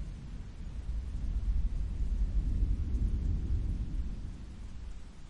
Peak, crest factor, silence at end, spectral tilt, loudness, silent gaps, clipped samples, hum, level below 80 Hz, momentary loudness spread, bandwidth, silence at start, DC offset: -20 dBFS; 14 dB; 0 s; -8 dB/octave; -37 LUFS; none; under 0.1%; none; -34 dBFS; 13 LU; 7.4 kHz; 0 s; under 0.1%